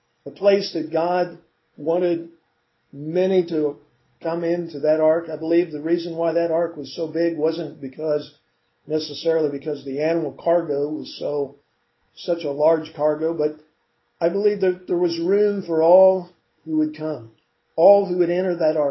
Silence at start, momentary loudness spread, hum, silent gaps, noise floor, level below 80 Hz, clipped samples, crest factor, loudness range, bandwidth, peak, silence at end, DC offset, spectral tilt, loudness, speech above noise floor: 0.25 s; 11 LU; none; none; -68 dBFS; -72 dBFS; under 0.1%; 18 dB; 5 LU; 6 kHz; -2 dBFS; 0 s; under 0.1%; -7.5 dB/octave; -21 LUFS; 48 dB